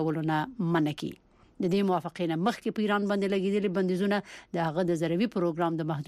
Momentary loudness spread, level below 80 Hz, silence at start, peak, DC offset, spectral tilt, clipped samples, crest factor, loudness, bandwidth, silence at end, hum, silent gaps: 5 LU; -66 dBFS; 0 s; -16 dBFS; under 0.1%; -7 dB/octave; under 0.1%; 14 dB; -29 LUFS; 13.5 kHz; 0.05 s; none; none